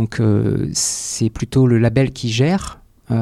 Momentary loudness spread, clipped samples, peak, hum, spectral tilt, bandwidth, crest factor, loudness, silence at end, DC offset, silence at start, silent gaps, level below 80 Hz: 7 LU; under 0.1%; -4 dBFS; none; -5.5 dB/octave; 14 kHz; 14 dB; -17 LUFS; 0 s; under 0.1%; 0 s; none; -40 dBFS